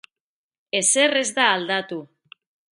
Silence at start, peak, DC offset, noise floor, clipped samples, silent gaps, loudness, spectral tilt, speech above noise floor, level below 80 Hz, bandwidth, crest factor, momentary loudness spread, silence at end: 0.75 s; -2 dBFS; under 0.1%; under -90 dBFS; under 0.1%; none; -19 LUFS; -1 dB/octave; over 69 dB; -76 dBFS; 11.5 kHz; 22 dB; 14 LU; 0.65 s